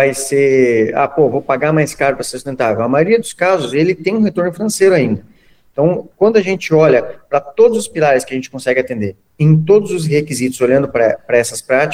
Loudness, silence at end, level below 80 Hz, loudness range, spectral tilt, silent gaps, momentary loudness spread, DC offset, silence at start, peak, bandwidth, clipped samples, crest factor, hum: -14 LUFS; 0 s; -52 dBFS; 1 LU; -6 dB/octave; none; 8 LU; under 0.1%; 0 s; 0 dBFS; 16 kHz; under 0.1%; 14 dB; none